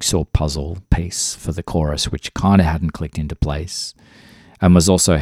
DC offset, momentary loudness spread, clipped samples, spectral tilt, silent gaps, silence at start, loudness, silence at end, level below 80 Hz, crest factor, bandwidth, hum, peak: under 0.1%; 13 LU; under 0.1%; -5 dB/octave; none; 0 s; -18 LUFS; 0 s; -28 dBFS; 18 dB; 15.5 kHz; none; 0 dBFS